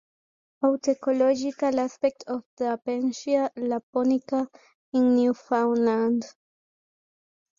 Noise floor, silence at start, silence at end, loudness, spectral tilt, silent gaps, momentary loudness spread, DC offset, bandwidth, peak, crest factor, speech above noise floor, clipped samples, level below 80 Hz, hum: under -90 dBFS; 0.6 s; 1.3 s; -25 LUFS; -5.5 dB/octave; 2.46-2.57 s, 3.83-3.93 s, 4.74-4.92 s; 7 LU; under 0.1%; 7.4 kHz; -10 dBFS; 14 dB; over 66 dB; under 0.1%; -72 dBFS; none